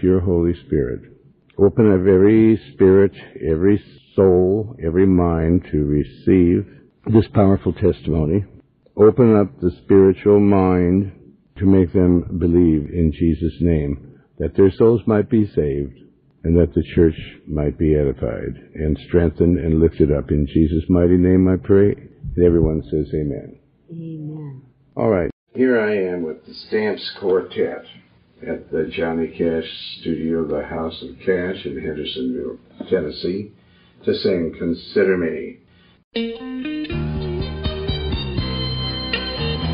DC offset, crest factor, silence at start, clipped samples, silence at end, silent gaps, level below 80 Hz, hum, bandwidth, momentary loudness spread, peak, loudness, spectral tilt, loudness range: under 0.1%; 18 dB; 0 s; under 0.1%; 0 s; 25.33-25.47 s, 36.04-36.11 s; -36 dBFS; none; 5.2 kHz; 15 LU; 0 dBFS; -18 LUFS; -11.5 dB/octave; 8 LU